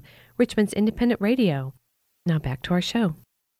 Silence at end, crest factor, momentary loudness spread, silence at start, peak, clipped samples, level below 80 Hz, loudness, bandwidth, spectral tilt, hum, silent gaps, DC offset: 0.45 s; 18 dB; 11 LU; 0.4 s; -8 dBFS; under 0.1%; -48 dBFS; -24 LUFS; 14 kHz; -6.5 dB/octave; none; none; under 0.1%